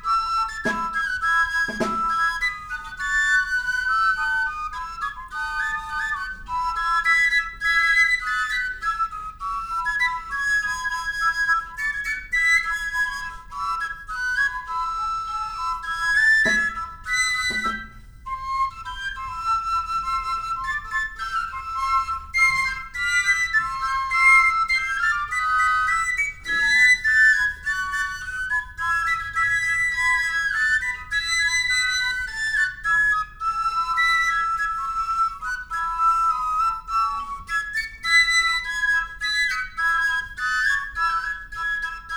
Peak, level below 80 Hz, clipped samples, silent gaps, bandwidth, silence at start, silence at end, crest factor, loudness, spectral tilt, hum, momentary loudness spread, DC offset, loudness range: -6 dBFS; -44 dBFS; under 0.1%; none; over 20 kHz; 0 s; 0 s; 18 dB; -21 LUFS; -0.5 dB/octave; none; 10 LU; under 0.1%; 6 LU